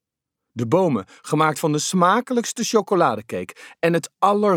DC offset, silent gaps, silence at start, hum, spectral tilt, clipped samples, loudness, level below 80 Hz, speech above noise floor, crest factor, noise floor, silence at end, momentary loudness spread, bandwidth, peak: under 0.1%; none; 0.55 s; none; -5 dB/octave; under 0.1%; -21 LUFS; -70 dBFS; 63 dB; 18 dB; -83 dBFS; 0 s; 12 LU; 18.5 kHz; -4 dBFS